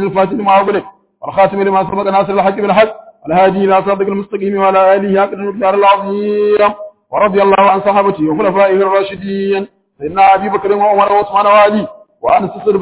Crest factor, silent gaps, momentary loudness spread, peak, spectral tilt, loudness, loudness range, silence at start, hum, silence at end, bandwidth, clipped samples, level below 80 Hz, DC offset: 12 dB; none; 9 LU; 0 dBFS; -10 dB/octave; -12 LUFS; 1 LU; 0 s; none; 0 s; 4 kHz; under 0.1%; -50 dBFS; under 0.1%